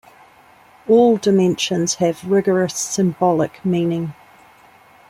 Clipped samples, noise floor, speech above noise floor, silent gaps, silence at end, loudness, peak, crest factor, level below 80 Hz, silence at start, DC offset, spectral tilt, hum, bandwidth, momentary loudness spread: under 0.1%; -49 dBFS; 32 dB; none; 0.95 s; -17 LUFS; -2 dBFS; 16 dB; -60 dBFS; 0.85 s; under 0.1%; -5 dB/octave; none; 15.5 kHz; 7 LU